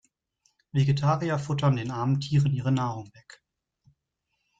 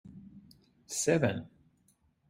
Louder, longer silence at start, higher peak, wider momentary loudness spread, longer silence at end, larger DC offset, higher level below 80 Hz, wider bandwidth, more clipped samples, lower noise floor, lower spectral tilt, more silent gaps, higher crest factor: first, -26 LUFS vs -31 LUFS; first, 0.75 s vs 0.05 s; about the same, -12 dBFS vs -12 dBFS; second, 8 LU vs 25 LU; first, 1.5 s vs 0.8 s; neither; first, -60 dBFS vs -66 dBFS; second, 7.8 kHz vs 16 kHz; neither; first, -80 dBFS vs -70 dBFS; first, -7.5 dB/octave vs -4.5 dB/octave; neither; second, 16 dB vs 22 dB